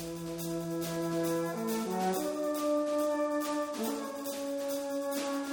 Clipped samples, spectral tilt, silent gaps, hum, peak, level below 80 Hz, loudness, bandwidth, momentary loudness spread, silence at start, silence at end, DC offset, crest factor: under 0.1%; -5 dB/octave; none; none; -20 dBFS; -68 dBFS; -33 LUFS; over 20 kHz; 6 LU; 0 s; 0 s; under 0.1%; 12 dB